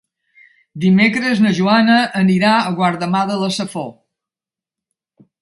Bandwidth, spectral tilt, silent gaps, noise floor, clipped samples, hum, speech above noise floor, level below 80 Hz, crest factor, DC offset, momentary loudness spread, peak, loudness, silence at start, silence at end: 11.5 kHz; -6 dB/octave; none; -89 dBFS; under 0.1%; none; 75 dB; -60 dBFS; 16 dB; under 0.1%; 9 LU; -2 dBFS; -15 LUFS; 0.75 s; 1.5 s